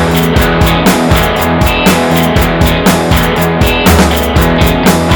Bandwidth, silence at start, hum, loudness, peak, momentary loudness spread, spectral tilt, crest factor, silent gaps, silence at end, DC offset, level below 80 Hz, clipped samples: over 20 kHz; 0 s; none; -9 LUFS; 0 dBFS; 2 LU; -5 dB/octave; 8 dB; none; 0 s; under 0.1%; -18 dBFS; 0.9%